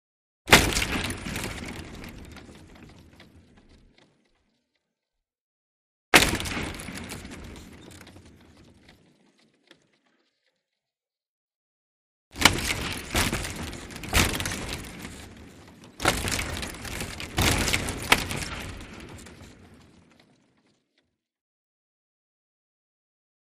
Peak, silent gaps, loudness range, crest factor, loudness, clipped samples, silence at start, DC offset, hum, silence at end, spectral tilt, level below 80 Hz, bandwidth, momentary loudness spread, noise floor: 0 dBFS; 5.41-6.12 s, 11.27-11.48 s, 11.54-12.31 s; 17 LU; 30 dB; -25 LUFS; under 0.1%; 0.45 s; under 0.1%; none; 3.7 s; -2.5 dB/octave; -42 dBFS; 15.5 kHz; 26 LU; under -90 dBFS